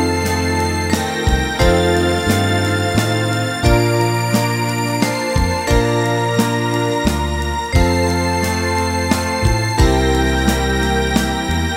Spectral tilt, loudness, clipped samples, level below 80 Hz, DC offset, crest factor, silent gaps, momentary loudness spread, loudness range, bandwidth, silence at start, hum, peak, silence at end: -5 dB/octave; -16 LUFS; under 0.1%; -24 dBFS; under 0.1%; 16 dB; none; 3 LU; 1 LU; 16.5 kHz; 0 s; none; 0 dBFS; 0 s